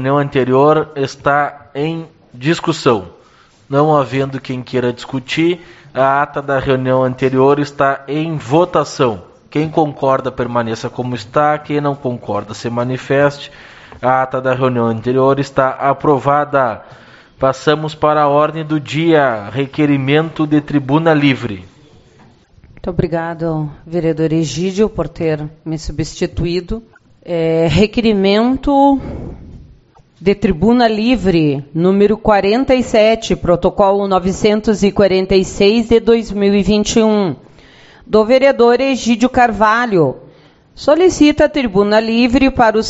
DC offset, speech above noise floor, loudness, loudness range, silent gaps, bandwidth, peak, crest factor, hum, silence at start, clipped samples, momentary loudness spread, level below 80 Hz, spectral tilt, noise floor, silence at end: under 0.1%; 34 dB; -14 LUFS; 5 LU; none; 8 kHz; 0 dBFS; 14 dB; none; 0 s; under 0.1%; 10 LU; -36 dBFS; -5 dB/octave; -47 dBFS; 0 s